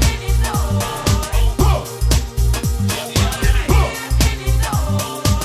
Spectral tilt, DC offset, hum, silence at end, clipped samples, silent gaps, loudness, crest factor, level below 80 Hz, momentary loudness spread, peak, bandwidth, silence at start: -4.5 dB/octave; under 0.1%; none; 0 s; under 0.1%; none; -18 LUFS; 14 dB; -18 dBFS; 3 LU; -2 dBFS; 16 kHz; 0 s